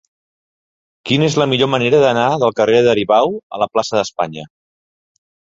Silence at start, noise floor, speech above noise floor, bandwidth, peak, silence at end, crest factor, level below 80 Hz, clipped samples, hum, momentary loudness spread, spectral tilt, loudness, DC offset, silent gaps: 1.05 s; under -90 dBFS; over 76 dB; 7.8 kHz; 0 dBFS; 1.1 s; 16 dB; -54 dBFS; under 0.1%; none; 9 LU; -5 dB/octave; -15 LUFS; under 0.1%; 3.43-3.50 s